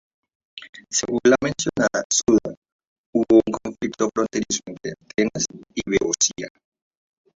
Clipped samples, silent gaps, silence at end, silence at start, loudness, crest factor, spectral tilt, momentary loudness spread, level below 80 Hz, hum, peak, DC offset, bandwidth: under 0.1%; 0.69-0.73 s, 2.05-2.10 s, 2.57-2.62 s, 2.72-2.79 s, 2.87-3.13 s; 0.9 s; 0.55 s; -21 LUFS; 20 dB; -3 dB/octave; 18 LU; -54 dBFS; none; -4 dBFS; under 0.1%; 7.8 kHz